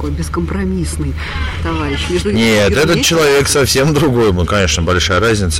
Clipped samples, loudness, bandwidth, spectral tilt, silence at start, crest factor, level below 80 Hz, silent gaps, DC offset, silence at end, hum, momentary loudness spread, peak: under 0.1%; -13 LUFS; 16.5 kHz; -4.5 dB/octave; 0 s; 10 dB; -26 dBFS; none; under 0.1%; 0 s; none; 9 LU; -2 dBFS